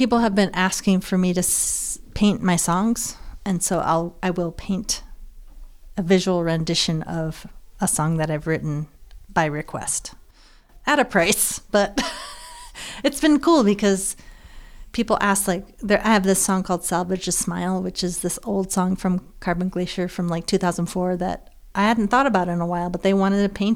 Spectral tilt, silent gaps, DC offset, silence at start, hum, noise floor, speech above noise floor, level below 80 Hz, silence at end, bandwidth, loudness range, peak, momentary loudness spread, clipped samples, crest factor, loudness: -4.5 dB/octave; none; under 0.1%; 0 s; none; -50 dBFS; 29 dB; -42 dBFS; 0 s; 16.5 kHz; 4 LU; -4 dBFS; 10 LU; under 0.1%; 18 dB; -21 LUFS